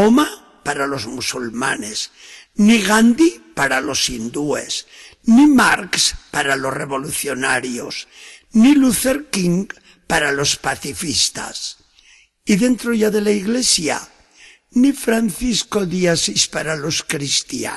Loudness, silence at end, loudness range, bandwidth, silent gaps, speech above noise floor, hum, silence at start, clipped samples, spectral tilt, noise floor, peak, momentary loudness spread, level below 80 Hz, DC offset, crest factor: -17 LUFS; 0 s; 3 LU; 12.5 kHz; none; 34 dB; none; 0 s; under 0.1%; -3.5 dB/octave; -51 dBFS; -2 dBFS; 13 LU; -46 dBFS; under 0.1%; 16 dB